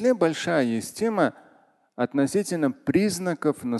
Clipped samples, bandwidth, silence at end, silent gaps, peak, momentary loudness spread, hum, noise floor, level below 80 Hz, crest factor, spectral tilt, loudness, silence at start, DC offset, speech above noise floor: under 0.1%; 12.5 kHz; 0 s; none; -8 dBFS; 4 LU; none; -59 dBFS; -62 dBFS; 16 dB; -5.5 dB/octave; -25 LUFS; 0 s; under 0.1%; 36 dB